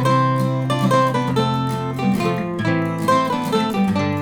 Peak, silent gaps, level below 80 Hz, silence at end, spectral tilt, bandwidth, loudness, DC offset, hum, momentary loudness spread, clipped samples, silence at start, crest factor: -4 dBFS; none; -52 dBFS; 0 s; -6.5 dB/octave; 18.5 kHz; -19 LUFS; under 0.1%; none; 5 LU; under 0.1%; 0 s; 14 dB